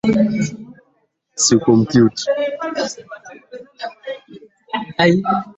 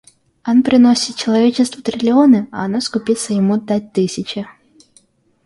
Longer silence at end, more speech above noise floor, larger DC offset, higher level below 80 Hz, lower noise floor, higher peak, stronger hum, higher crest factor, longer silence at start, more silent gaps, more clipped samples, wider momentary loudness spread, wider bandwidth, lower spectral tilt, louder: second, 0.05 s vs 0.95 s; first, 48 dB vs 40 dB; neither; about the same, -54 dBFS vs -58 dBFS; first, -64 dBFS vs -54 dBFS; about the same, 0 dBFS vs -2 dBFS; neither; about the same, 18 dB vs 14 dB; second, 0.05 s vs 0.45 s; neither; neither; first, 23 LU vs 12 LU; second, 8.4 kHz vs 11.5 kHz; about the same, -4.5 dB/octave vs -5 dB/octave; about the same, -17 LUFS vs -15 LUFS